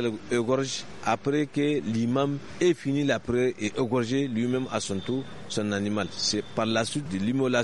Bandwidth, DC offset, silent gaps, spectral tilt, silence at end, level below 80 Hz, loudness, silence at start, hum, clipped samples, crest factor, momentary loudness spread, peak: 11.5 kHz; 0.4%; none; -5 dB/octave; 0 s; -58 dBFS; -27 LUFS; 0 s; none; under 0.1%; 18 dB; 4 LU; -8 dBFS